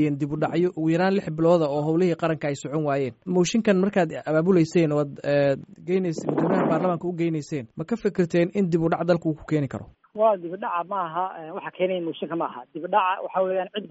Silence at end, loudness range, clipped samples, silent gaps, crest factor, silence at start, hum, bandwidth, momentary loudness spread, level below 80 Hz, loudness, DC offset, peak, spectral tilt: 0 s; 4 LU; under 0.1%; none; 18 dB; 0 s; none; 8 kHz; 9 LU; -60 dBFS; -24 LUFS; under 0.1%; -6 dBFS; -6.5 dB/octave